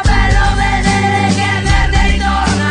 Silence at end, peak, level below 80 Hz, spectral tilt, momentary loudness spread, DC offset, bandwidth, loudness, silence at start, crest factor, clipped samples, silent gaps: 0 s; 0 dBFS; -16 dBFS; -5 dB/octave; 2 LU; under 0.1%; 10.5 kHz; -13 LUFS; 0 s; 12 dB; under 0.1%; none